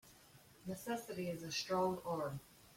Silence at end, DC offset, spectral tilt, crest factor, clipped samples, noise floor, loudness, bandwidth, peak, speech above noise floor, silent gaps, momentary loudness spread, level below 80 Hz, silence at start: 0 s; under 0.1%; -4.5 dB/octave; 16 dB; under 0.1%; -64 dBFS; -41 LUFS; 16.5 kHz; -26 dBFS; 23 dB; none; 16 LU; -74 dBFS; 0.05 s